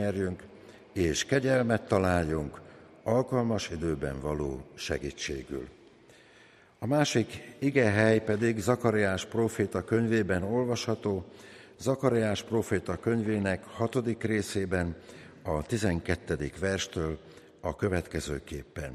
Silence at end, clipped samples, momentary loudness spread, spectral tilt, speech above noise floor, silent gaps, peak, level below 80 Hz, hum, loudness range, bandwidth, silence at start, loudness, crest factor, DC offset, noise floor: 0 s; under 0.1%; 12 LU; -5.5 dB/octave; 29 dB; none; -10 dBFS; -50 dBFS; none; 6 LU; 14.5 kHz; 0 s; -30 LUFS; 20 dB; under 0.1%; -58 dBFS